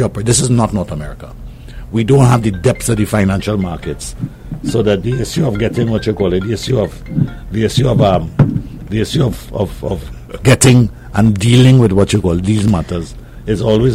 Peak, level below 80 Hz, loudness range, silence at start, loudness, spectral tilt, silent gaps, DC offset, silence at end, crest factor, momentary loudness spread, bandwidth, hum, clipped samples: 0 dBFS; -30 dBFS; 5 LU; 0 s; -14 LUFS; -6 dB/octave; none; under 0.1%; 0 s; 14 dB; 15 LU; 15 kHz; none; under 0.1%